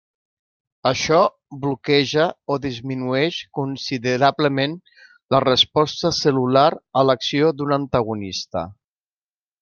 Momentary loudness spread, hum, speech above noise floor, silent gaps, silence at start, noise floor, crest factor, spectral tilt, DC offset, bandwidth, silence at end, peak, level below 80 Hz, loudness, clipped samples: 10 LU; none; over 70 dB; 5.23-5.27 s; 0.85 s; under -90 dBFS; 18 dB; -5 dB/octave; under 0.1%; 7.2 kHz; 0.9 s; -2 dBFS; -56 dBFS; -20 LUFS; under 0.1%